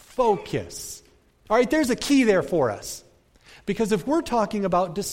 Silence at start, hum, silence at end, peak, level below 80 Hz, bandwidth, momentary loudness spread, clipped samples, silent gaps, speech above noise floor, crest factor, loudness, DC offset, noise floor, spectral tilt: 0.15 s; none; 0 s; -8 dBFS; -50 dBFS; 16.5 kHz; 16 LU; under 0.1%; none; 31 dB; 16 dB; -23 LUFS; under 0.1%; -54 dBFS; -5 dB/octave